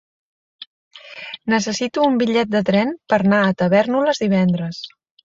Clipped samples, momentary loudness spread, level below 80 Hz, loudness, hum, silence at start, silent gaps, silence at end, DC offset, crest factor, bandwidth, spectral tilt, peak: under 0.1%; 17 LU; -58 dBFS; -18 LUFS; none; 0.6 s; 0.67-0.91 s; 0.35 s; under 0.1%; 18 dB; 7.8 kHz; -6 dB/octave; -2 dBFS